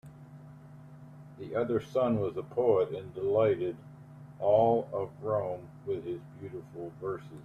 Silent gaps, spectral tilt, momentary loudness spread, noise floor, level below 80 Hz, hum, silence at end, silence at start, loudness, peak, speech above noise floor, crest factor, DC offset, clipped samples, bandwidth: none; -8.5 dB/octave; 24 LU; -50 dBFS; -66 dBFS; none; 0 s; 0.05 s; -31 LUFS; -14 dBFS; 20 dB; 18 dB; under 0.1%; under 0.1%; 9.2 kHz